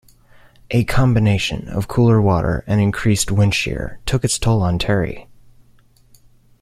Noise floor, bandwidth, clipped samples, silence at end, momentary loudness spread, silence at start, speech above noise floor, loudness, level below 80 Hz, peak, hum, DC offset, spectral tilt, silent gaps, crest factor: -51 dBFS; 15 kHz; under 0.1%; 1.4 s; 8 LU; 0.7 s; 35 dB; -18 LUFS; -34 dBFS; -2 dBFS; none; under 0.1%; -5.5 dB/octave; none; 16 dB